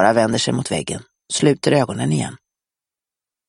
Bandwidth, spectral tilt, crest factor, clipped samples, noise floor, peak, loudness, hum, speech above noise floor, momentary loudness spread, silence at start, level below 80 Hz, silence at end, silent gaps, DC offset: 12 kHz; -5 dB/octave; 18 dB; under 0.1%; -89 dBFS; -2 dBFS; -19 LUFS; none; 71 dB; 12 LU; 0 s; -54 dBFS; 1.1 s; none; under 0.1%